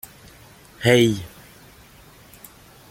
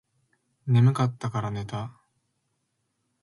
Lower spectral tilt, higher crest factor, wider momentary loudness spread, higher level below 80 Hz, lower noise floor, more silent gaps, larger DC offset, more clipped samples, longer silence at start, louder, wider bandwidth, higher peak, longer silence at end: second, -5 dB/octave vs -7.5 dB/octave; first, 24 dB vs 18 dB; first, 28 LU vs 17 LU; first, -54 dBFS vs -60 dBFS; second, -48 dBFS vs -76 dBFS; neither; neither; neither; first, 0.8 s vs 0.65 s; first, -19 LUFS vs -26 LUFS; first, 17 kHz vs 11.5 kHz; first, -2 dBFS vs -10 dBFS; first, 1.65 s vs 1.35 s